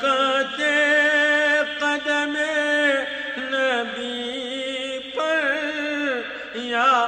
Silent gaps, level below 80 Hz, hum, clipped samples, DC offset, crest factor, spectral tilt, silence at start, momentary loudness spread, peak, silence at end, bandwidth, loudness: none; -64 dBFS; 50 Hz at -65 dBFS; under 0.1%; under 0.1%; 14 dB; -1.5 dB/octave; 0 s; 11 LU; -8 dBFS; 0 s; 9.4 kHz; -21 LUFS